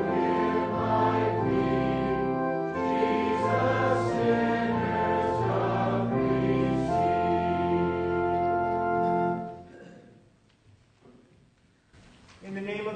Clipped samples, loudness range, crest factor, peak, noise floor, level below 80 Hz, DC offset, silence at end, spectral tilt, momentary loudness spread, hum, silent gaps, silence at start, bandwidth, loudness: under 0.1%; 7 LU; 16 dB; -12 dBFS; -63 dBFS; -52 dBFS; under 0.1%; 0 s; -8 dB/octave; 4 LU; none; none; 0 s; 9.4 kHz; -27 LUFS